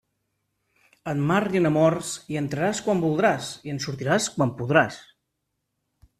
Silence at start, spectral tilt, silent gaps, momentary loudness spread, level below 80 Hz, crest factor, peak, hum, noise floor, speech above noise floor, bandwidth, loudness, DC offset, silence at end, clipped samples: 1.05 s; -5.5 dB/octave; none; 10 LU; -60 dBFS; 22 dB; -4 dBFS; none; -79 dBFS; 55 dB; 14 kHz; -24 LUFS; under 0.1%; 1.2 s; under 0.1%